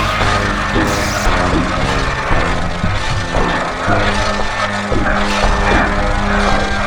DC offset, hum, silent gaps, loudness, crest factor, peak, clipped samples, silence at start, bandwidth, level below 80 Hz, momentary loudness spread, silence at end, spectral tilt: under 0.1%; none; none; -15 LUFS; 14 dB; 0 dBFS; under 0.1%; 0 s; 19.5 kHz; -20 dBFS; 4 LU; 0 s; -4.5 dB/octave